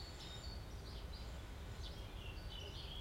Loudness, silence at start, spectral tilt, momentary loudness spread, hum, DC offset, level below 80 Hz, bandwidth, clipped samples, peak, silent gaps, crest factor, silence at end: -51 LUFS; 0 s; -4.5 dB/octave; 2 LU; none; under 0.1%; -52 dBFS; 16.5 kHz; under 0.1%; -36 dBFS; none; 12 dB; 0 s